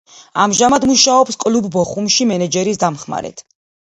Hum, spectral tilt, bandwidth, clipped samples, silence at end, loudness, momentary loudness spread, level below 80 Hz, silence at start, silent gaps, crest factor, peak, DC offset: none; -3 dB/octave; 11 kHz; under 0.1%; 0.45 s; -14 LUFS; 14 LU; -52 dBFS; 0.35 s; none; 16 dB; 0 dBFS; under 0.1%